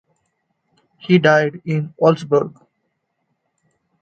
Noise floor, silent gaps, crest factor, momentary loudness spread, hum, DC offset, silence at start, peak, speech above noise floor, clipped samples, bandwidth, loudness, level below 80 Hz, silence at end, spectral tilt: -72 dBFS; none; 20 dB; 12 LU; none; under 0.1%; 1.05 s; 0 dBFS; 56 dB; under 0.1%; 8.2 kHz; -17 LUFS; -64 dBFS; 1.5 s; -7 dB/octave